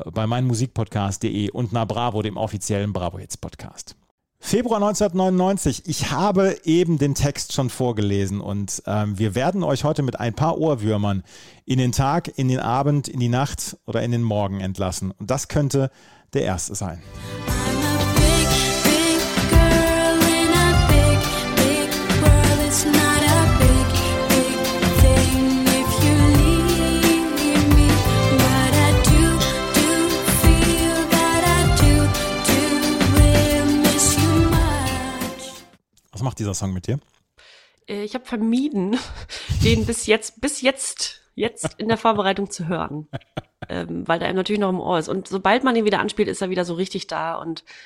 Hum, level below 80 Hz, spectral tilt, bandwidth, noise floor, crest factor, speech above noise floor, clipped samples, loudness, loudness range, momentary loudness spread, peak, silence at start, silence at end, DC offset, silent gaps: none; -28 dBFS; -4.5 dB/octave; 16.5 kHz; -55 dBFS; 18 dB; 33 dB; under 0.1%; -19 LUFS; 8 LU; 12 LU; -2 dBFS; 0 s; 0.1 s; under 0.1%; 4.11-4.18 s